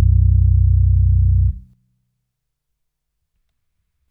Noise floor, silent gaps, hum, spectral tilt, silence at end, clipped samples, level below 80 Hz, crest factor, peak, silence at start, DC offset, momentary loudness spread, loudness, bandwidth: -75 dBFS; none; none; -14 dB/octave; 2.5 s; under 0.1%; -20 dBFS; 12 dB; -4 dBFS; 0 s; under 0.1%; 6 LU; -15 LUFS; 0.4 kHz